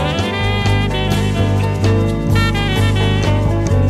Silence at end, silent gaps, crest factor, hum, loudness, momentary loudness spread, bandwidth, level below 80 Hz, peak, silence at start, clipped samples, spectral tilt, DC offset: 0 s; none; 12 dB; 50 Hz at -20 dBFS; -16 LUFS; 2 LU; 13.5 kHz; -24 dBFS; -4 dBFS; 0 s; under 0.1%; -6 dB/octave; under 0.1%